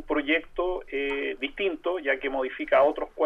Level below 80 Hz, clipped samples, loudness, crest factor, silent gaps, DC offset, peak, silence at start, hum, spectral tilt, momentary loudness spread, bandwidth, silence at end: -48 dBFS; under 0.1%; -27 LUFS; 18 dB; none; under 0.1%; -8 dBFS; 0 s; none; -5.5 dB/octave; 8 LU; 5.8 kHz; 0 s